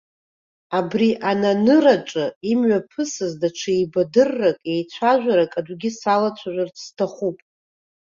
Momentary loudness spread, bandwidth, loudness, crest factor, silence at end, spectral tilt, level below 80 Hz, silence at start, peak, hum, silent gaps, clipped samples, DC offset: 10 LU; 7.6 kHz; -20 LUFS; 18 dB; 0.85 s; -5.5 dB/octave; -64 dBFS; 0.7 s; -2 dBFS; none; 2.36-2.41 s; under 0.1%; under 0.1%